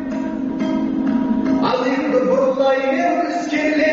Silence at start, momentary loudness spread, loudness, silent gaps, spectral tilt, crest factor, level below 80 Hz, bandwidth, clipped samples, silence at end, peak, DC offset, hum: 0 s; 5 LU; -18 LUFS; none; -4 dB/octave; 12 dB; -50 dBFS; 7.4 kHz; under 0.1%; 0 s; -6 dBFS; under 0.1%; none